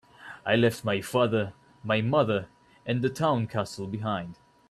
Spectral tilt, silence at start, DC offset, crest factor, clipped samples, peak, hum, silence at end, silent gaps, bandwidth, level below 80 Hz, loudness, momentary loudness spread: -6 dB/octave; 0.2 s; under 0.1%; 18 dB; under 0.1%; -10 dBFS; none; 0.35 s; none; 14 kHz; -62 dBFS; -27 LUFS; 16 LU